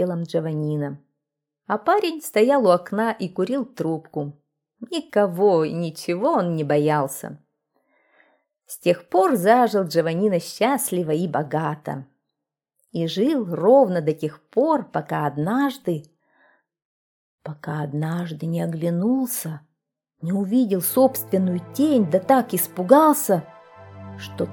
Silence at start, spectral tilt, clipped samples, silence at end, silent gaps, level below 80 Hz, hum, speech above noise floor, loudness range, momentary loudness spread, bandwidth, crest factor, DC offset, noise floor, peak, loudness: 0 s; -6 dB/octave; under 0.1%; 0 s; 16.85-17.38 s; -70 dBFS; none; 62 dB; 7 LU; 15 LU; over 20 kHz; 22 dB; under 0.1%; -83 dBFS; 0 dBFS; -21 LUFS